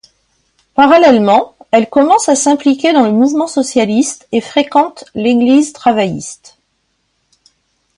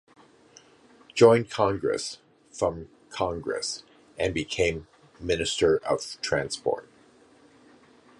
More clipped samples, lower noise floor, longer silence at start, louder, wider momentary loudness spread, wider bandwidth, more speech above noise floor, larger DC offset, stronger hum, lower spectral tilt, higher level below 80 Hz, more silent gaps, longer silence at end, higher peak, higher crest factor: neither; first, -64 dBFS vs -57 dBFS; second, 0.75 s vs 1.15 s; first, -11 LUFS vs -26 LUFS; second, 10 LU vs 19 LU; about the same, 11.5 kHz vs 11.5 kHz; first, 53 dB vs 32 dB; neither; neither; about the same, -4 dB/octave vs -4.5 dB/octave; about the same, -56 dBFS vs -52 dBFS; neither; first, 1.65 s vs 1.35 s; first, 0 dBFS vs -4 dBFS; second, 12 dB vs 24 dB